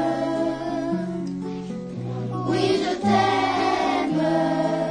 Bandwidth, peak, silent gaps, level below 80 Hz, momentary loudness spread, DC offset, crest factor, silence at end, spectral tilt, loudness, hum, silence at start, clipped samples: 10 kHz; -8 dBFS; none; -54 dBFS; 11 LU; under 0.1%; 14 dB; 0 s; -6 dB/octave; -23 LUFS; none; 0 s; under 0.1%